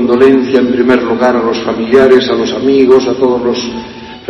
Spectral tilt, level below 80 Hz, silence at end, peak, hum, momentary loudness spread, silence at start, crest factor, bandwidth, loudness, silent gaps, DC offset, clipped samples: -5.5 dB/octave; -44 dBFS; 0 s; 0 dBFS; none; 8 LU; 0 s; 10 dB; 7 kHz; -9 LUFS; none; under 0.1%; 0.5%